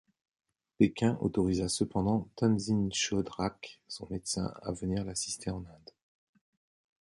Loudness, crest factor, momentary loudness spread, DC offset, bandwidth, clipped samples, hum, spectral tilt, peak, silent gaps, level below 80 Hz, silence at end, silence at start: -32 LUFS; 22 dB; 11 LU; under 0.1%; 11.5 kHz; under 0.1%; none; -5 dB/octave; -10 dBFS; none; -54 dBFS; 1.25 s; 0.8 s